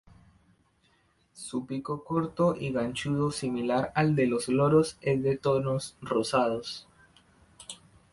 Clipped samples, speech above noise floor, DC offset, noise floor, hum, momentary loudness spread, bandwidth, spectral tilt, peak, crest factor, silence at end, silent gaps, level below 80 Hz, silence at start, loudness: under 0.1%; 40 dB; under 0.1%; -67 dBFS; none; 17 LU; 11.5 kHz; -6 dB/octave; -10 dBFS; 18 dB; 0.35 s; none; -60 dBFS; 1.35 s; -28 LUFS